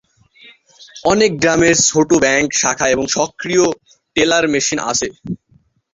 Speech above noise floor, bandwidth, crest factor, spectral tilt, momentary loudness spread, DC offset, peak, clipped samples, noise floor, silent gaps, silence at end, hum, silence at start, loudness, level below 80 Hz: 40 dB; 7.8 kHz; 16 dB; -3 dB/octave; 11 LU; under 0.1%; 0 dBFS; under 0.1%; -55 dBFS; none; 0.6 s; none; 0.8 s; -14 LUFS; -46 dBFS